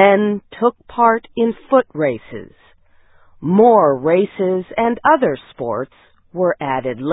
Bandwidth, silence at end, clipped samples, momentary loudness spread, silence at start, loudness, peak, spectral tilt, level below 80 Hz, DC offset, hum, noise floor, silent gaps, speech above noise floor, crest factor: 4 kHz; 0 s; under 0.1%; 13 LU; 0 s; -16 LUFS; 0 dBFS; -11.5 dB/octave; -54 dBFS; under 0.1%; none; -50 dBFS; none; 34 dB; 16 dB